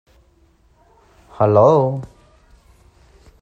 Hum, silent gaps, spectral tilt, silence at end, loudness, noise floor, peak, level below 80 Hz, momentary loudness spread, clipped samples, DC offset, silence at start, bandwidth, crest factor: none; none; -9.5 dB/octave; 1.35 s; -15 LUFS; -55 dBFS; 0 dBFS; -52 dBFS; 19 LU; under 0.1%; under 0.1%; 1.4 s; 8 kHz; 20 dB